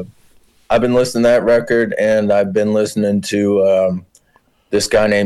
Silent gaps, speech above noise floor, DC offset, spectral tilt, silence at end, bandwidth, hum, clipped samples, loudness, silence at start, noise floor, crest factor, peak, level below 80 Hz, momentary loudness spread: none; 43 dB; under 0.1%; -5 dB/octave; 0 s; 12.5 kHz; none; under 0.1%; -15 LUFS; 0 s; -56 dBFS; 10 dB; -6 dBFS; -44 dBFS; 6 LU